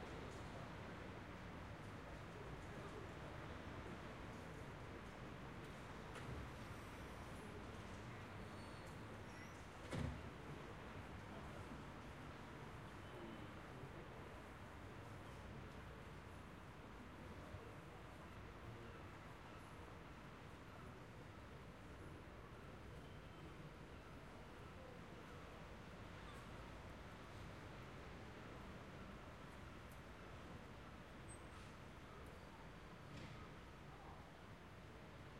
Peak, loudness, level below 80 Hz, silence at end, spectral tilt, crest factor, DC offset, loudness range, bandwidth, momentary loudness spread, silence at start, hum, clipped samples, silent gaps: -34 dBFS; -56 LUFS; -64 dBFS; 0 s; -5.5 dB/octave; 22 dB; under 0.1%; 5 LU; 15.5 kHz; 5 LU; 0 s; none; under 0.1%; none